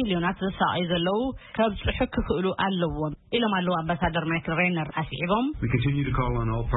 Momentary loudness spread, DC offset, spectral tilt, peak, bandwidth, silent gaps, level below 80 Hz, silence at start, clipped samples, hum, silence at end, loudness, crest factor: 4 LU; under 0.1%; -11 dB/octave; -10 dBFS; 4.1 kHz; none; -40 dBFS; 0 s; under 0.1%; none; 0 s; -26 LUFS; 16 dB